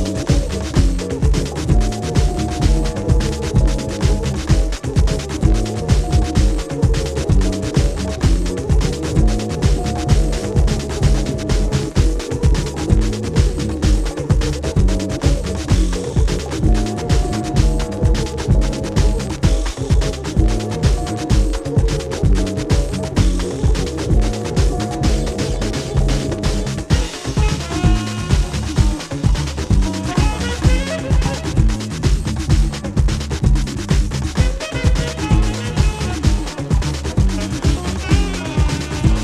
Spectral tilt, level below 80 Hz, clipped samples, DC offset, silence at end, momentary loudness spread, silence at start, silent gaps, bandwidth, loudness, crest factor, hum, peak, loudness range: -6 dB/octave; -18 dBFS; under 0.1%; under 0.1%; 0 s; 3 LU; 0 s; none; 12.5 kHz; -19 LUFS; 16 dB; none; 0 dBFS; 1 LU